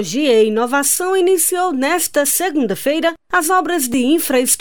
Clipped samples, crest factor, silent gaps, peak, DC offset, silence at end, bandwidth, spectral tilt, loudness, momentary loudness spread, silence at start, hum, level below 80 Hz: under 0.1%; 12 dB; none; -4 dBFS; 0.8%; 0 s; over 20 kHz; -2 dB/octave; -15 LUFS; 4 LU; 0 s; none; -56 dBFS